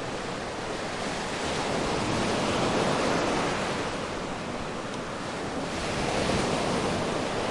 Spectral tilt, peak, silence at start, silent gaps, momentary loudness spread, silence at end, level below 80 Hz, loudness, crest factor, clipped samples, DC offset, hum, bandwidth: -4 dB/octave; -14 dBFS; 0 s; none; 8 LU; 0 s; -46 dBFS; -29 LUFS; 16 dB; under 0.1%; under 0.1%; none; 11.5 kHz